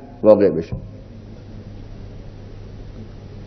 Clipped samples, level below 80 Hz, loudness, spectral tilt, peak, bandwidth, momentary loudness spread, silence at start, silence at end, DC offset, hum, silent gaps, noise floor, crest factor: under 0.1%; -40 dBFS; -16 LUFS; -9.5 dB/octave; 0 dBFS; 6.2 kHz; 25 LU; 0 s; 0 s; under 0.1%; none; none; -37 dBFS; 22 dB